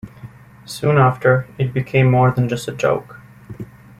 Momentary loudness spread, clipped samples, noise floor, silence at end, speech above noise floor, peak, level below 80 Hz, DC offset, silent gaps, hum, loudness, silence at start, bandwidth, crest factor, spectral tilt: 21 LU; under 0.1%; -39 dBFS; 0.35 s; 23 dB; -2 dBFS; -50 dBFS; under 0.1%; none; none; -17 LUFS; 0.05 s; 13.5 kHz; 18 dB; -7 dB/octave